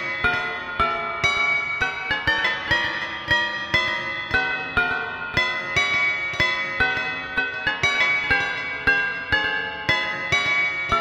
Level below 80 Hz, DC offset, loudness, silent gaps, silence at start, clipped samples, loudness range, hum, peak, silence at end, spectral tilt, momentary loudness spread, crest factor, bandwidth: -46 dBFS; under 0.1%; -21 LUFS; none; 0 s; under 0.1%; 1 LU; none; -4 dBFS; 0 s; -3 dB/octave; 6 LU; 20 dB; 16 kHz